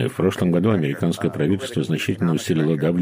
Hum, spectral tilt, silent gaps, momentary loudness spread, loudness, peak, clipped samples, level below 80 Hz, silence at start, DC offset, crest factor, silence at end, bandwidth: none; -6.5 dB/octave; none; 4 LU; -21 LUFS; -6 dBFS; under 0.1%; -58 dBFS; 0 s; under 0.1%; 14 dB; 0 s; 16 kHz